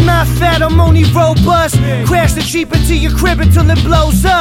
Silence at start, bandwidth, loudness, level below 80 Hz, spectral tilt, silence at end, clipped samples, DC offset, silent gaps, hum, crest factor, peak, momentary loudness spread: 0 s; 16.5 kHz; -10 LUFS; -16 dBFS; -5.5 dB/octave; 0 s; under 0.1%; under 0.1%; none; none; 10 dB; 0 dBFS; 4 LU